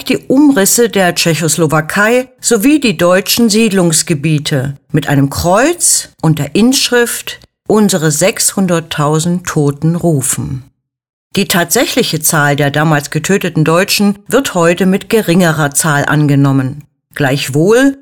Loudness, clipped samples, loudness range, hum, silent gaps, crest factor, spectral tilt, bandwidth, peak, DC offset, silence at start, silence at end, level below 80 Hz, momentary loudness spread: -11 LUFS; under 0.1%; 3 LU; none; 11.09-11.31 s; 10 dB; -4 dB/octave; 18.5 kHz; 0 dBFS; 0.2%; 0 s; 0.05 s; -44 dBFS; 6 LU